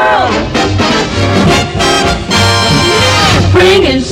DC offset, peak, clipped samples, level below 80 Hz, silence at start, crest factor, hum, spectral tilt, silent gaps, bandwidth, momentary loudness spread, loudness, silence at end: under 0.1%; 0 dBFS; under 0.1%; -24 dBFS; 0 s; 8 dB; none; -4.5 dB/octave; none; 16 kHz; 4 LU; -8 LUFS; 0 s